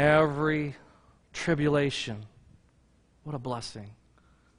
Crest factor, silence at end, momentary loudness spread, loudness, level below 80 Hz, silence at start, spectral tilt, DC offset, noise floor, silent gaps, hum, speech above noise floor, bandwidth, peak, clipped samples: 20 dB; 0.65 s; 22 LU; -29 LUFS; -56 dBFS; 0 s; -6 dB/octave; under 0.1%; -64 dBFS; none; none; 36 dB; 10.5 kHz; -10 dBFS; under 0.1%